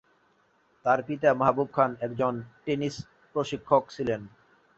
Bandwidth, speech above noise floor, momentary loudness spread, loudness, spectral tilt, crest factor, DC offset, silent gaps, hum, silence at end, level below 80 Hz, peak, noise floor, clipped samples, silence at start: 8 kHz; 40 dB; 10 LU; -28 LUFS; -6.5 dB/octave; 22 dB; under 0.1%; none; none; 0.5 s; -62 dBFS; -6 dBFS; -66 dBFS; under 0.1%; 0.85 s